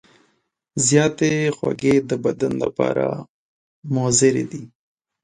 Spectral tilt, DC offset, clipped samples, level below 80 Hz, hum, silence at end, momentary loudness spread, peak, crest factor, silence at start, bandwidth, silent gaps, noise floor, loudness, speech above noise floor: -4.5 dB/octave; under 0.1%; under 0.1%; -56 dBFS; none; 0.55 s; 15 LU; -2 dBFS; 18 dB; 0.75 s; 11.5 kHz; 3.29-3.82 s; -69 dBFS; -19 LUFS; 49 dB